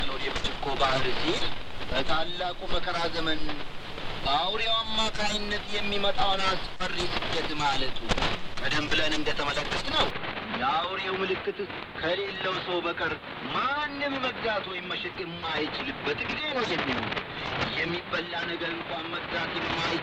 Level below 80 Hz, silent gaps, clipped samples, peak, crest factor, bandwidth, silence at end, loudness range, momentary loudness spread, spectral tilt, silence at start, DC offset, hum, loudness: -42 dBFS; none; under 0.1%; -8 dBFS; 18 dB; 10.5 kHz; 0 s; 2 LU; 7 LU; -4 dB/octave; 0 s; under 0.1%; none; -29 LUFS